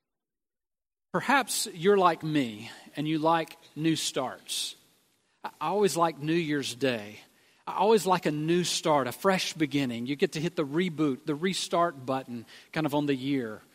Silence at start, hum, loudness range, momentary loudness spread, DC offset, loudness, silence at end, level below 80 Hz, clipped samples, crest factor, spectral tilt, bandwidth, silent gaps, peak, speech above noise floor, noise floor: 1.15 s; none; 3 LU; 11 LU; under 0.1%; -28 LUFS; 0.15 s; -74 dBFS; under 0.1%; 20 dB; -4.5 dB/octave; 16 kHz; none; -8 dBFS; over 62 dB; under -90 dBFS